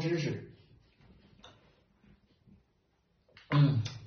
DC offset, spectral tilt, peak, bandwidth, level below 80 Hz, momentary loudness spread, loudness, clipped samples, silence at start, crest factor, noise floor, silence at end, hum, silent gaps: under 0.1%; -7 dB/octave; -16 dBFS; 6.6 kHz; -66 dBFS; 17 LU; -30 LUFS; under 0.1%; 0 s; 20 dB; -74 dBFS; 0 s; none; none